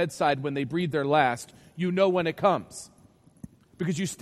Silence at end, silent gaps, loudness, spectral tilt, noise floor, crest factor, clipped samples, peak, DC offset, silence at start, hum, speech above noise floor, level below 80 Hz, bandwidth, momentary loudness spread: 0.05 s; none; -26 LUFS; -5.5 dB/octave; -49 dBFS; 20 dB; under 0.1%; -8 dBFS; under 0.1%; 0 s; none; 22 dB; -64 dBFS; 15 kHz; 13 LU